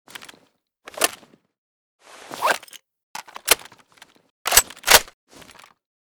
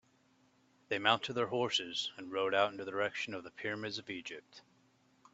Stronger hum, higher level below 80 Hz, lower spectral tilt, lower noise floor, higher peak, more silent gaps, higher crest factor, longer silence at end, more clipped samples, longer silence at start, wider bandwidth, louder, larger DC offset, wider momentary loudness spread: neither; first, -50 dBFS vs -82 dBFS; second, 1 dB/octave vs -3.5 dB/octave; second, -62 dBFS vs -71 dBFS; first, 0 dBFS vs -12 dBFS; first, 1.58-1.99 s, 3.03-3.14 s, 4.30-4.45 s vs none; about the same, 26 dB vs 26 dB; first, 0.95 s vs 0.75 s; neither; about the same, 0.95 s vs 0.9 s; first, over 20 kHz vs 8.2 kHz; first, -19 LUFS vs -35 LUFS; neither; first, 26 LU vs 11 LU